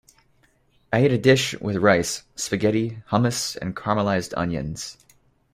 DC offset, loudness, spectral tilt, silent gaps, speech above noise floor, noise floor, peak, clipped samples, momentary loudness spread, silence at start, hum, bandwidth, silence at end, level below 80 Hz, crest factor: under 0.1%; -22 LUFS; -5 dB/octave; none; 40 dB; -62 dBFS; -4 dBFS; under 0.1%; 11 LU; 0.9 s; none; 16 kHz; 0.6 s; -52 dBFS; 20 dB